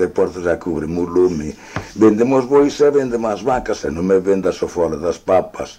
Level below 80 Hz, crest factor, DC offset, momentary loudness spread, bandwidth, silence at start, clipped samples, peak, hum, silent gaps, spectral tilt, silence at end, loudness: -42 dBFS; 14 dB; under 0.1%; 8 LU; 10 kHz; 0 s; under 0.1%; -2 dBFS; none; none; -6.5 dB/octave; 0.05 s; -17 LUFS